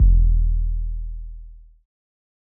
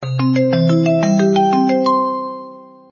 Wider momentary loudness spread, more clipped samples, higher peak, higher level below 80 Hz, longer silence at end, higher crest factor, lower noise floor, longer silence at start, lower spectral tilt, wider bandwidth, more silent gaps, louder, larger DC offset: first, 21 LU vs 10 LU; neither; about the same, -6 dBFS vs -4 dBFS; first, -20 dBFS vs -58 dBFS; first, 1 s vs 0.25 s; about the same, 14 dB vs 12 dB; about the same, -40 dBFS vs -37 dBFS; about the same, 0 s vs 0 s; first, -21 dB/octave vs -7.5 dB/octave; second, 0.4 kHz vs 7.2 kHz; neither; second, -23 LUFS vs -15 LUFS; neither